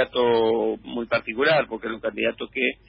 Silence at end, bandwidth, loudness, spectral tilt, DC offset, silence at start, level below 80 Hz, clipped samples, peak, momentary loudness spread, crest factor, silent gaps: 0.15 s; 5 kHz; -23 LUFS; -9.5 dB/octave; under 0.1%; 0 s; -56 dBFS; under 0.1%; -8 dBFS; 9 LU; 14 dB; none